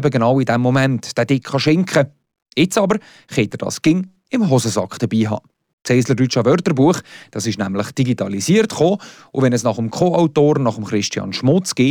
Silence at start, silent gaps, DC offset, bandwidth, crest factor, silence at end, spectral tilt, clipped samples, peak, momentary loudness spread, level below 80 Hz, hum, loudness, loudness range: 0 s; 5.73-5.78 s; under 0.1%; 19 kHz; 12 dB; 0 s; -5.5 dB/octave; under 0.1%; -4 dBFS; 8 LU; -56 dBFS; none; -17 LUFS; 2 LU